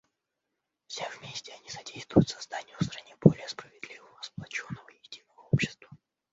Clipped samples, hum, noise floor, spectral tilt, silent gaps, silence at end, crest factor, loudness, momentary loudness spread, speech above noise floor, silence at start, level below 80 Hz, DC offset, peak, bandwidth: under 0.1%; none; -84 dBFS; -6 dB/octave; none; 0.35 s; 28 dB; -30 LUFS; 21 LU; 56 dB; 0.9 s; -58 dBFS; under 0.1%; -4 dBFS; 8 kHz